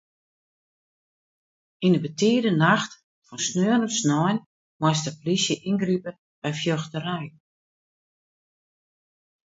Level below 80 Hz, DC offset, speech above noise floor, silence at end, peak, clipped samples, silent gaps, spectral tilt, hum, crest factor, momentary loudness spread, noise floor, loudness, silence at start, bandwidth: -68 dBFS; under 0.1%; over 67 dB; 2.25 s; -4 dBFS; under 0.1%; 3.04-3.22 s, 4.46-4.80 s, 6.19-6.42 s; -4.5 dB/octave; none; 22 dB; 12 LU; under -90 dBFS; -24 LUFS; 1.8 s; 8 kHz